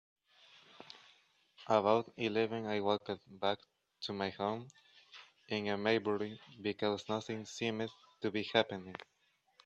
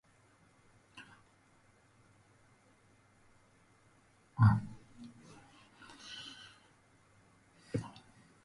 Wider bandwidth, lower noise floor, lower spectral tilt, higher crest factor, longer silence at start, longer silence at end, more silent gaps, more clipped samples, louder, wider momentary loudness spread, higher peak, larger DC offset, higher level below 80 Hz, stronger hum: second, 8.2 kHz vs 11 kHz; about the same, -70 dBFS vs -67 dBFS; second, -5 dB/octave vs -7 dB/octave; about the same, 24 dB vs 26 dB; second, 0.8 s vs 0.95 s; about the same, 0.6 s vs 0.55 s; neither; neither; about the same, -37 LUFS vs -35 LUFS; second, 21 LU vs 29 LU; about the same, -14 dBFS vs -14 dBFS; neither; second, -80 dBFS vs -60 dBFS; neither